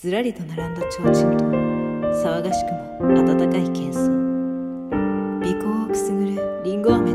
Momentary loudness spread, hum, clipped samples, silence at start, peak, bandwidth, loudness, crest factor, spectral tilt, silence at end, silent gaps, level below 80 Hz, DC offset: 9 LU; none; under 0.1%; 0 s; -4 dBFS; 15 kHz; -21 LUFS; 18 dB; -7 dB/octave; 0 s; none; -46 dBFS; under 0.1%